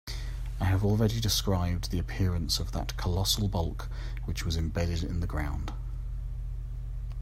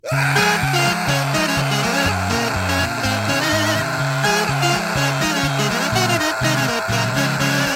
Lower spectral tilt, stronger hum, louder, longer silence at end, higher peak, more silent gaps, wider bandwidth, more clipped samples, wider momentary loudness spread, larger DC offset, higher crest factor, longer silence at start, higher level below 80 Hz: about the same, -5 dB/octave vs -4 dB/octave; neither; second, -31 LUFS vs -18 LUFS; about the same, 0 s vs 0 s; second, -12 dBFS vs -4 dBFS; neither; about the same, 16 kHz vs 17 kHz; neither; first, 12 LU vs 3 LU; neither; about the same, 18 dB vs 14 dB; about the same, 0.05 s vs 0.05 s; first, -36 dBFS vs -42 dBFS